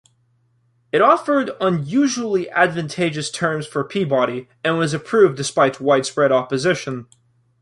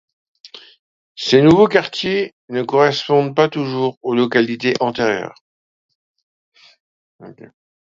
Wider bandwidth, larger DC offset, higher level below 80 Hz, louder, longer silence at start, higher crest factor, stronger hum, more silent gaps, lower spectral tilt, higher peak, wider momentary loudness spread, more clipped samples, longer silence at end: first, 11.5 kHz vs 7.6 kHz; neither; second, -62 dBFS vs -56 dBFS; second, -19 LUFS vs -16 LUFS; first, 0.95 s vs 0.45 s; about the same, 18 dB vs 18 dB; neither; second, none vs 0.79-1.15 s, 2.33-2.48 s, 3.97-4.01 s, 5.41-5.89 s, 5.95-6.14 s, 6.23-6.52 s, 6.80-7.19 s; about the same, -5 dB/octave vs -6 dB/octave; about the same, -2 dBFS vs 0 dBFS; second, 7 LU vs 12 LU; neither; about the same, 0.6 s vs 0.5 s